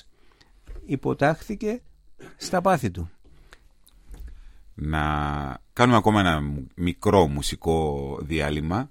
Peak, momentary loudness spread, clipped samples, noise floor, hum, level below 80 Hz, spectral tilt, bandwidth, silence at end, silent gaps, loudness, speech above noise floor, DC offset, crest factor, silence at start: -4 dBFS; 16 LU; under 0.1%; -55 dBFS; none; -40 dBFS; -6 dB/octave; 16.5 kHz; 0.05 s; none; -24 LUFS; 31 dB; under 0.1%; 22 dB; 0.7 s